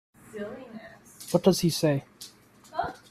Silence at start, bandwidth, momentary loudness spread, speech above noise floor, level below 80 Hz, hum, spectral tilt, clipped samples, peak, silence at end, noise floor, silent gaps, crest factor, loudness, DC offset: 0.35 s; 15 kHz; 22 LU; 22 dB; -60 dBFS; none; -5.5 dB/octave; under 0.1%; -8 dBFS; 0.15 s; -48 dBFS; none; 22 dB; -27 LUFS; under 0.1%